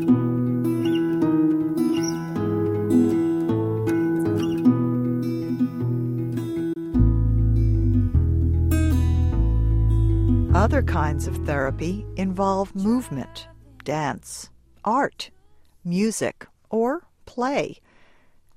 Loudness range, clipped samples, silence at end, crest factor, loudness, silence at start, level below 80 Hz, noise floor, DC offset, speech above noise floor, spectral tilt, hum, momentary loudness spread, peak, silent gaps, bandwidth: 6 LU; under 0.1%; 0.85 s; 16 dB; -23 LUFS; 0 s; -30 dBFS; -54 dBFS; under 0.1%; 29 dB; -7.5 dB/octave; none; 9 LU; -6 dBFS; none; 16 kHz